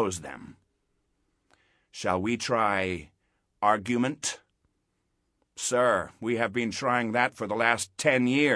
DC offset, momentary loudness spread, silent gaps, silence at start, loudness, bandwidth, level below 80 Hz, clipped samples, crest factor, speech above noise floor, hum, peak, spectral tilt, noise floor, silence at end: under 0.1%; 11 LU; none; 0 s; -27 LUFS; 11 kHz; -64 dBFS; under 0.1%; 22 dB; 49 dB; none; -6 dBFS; -4 dB/octave; -76 dBFS; 0 s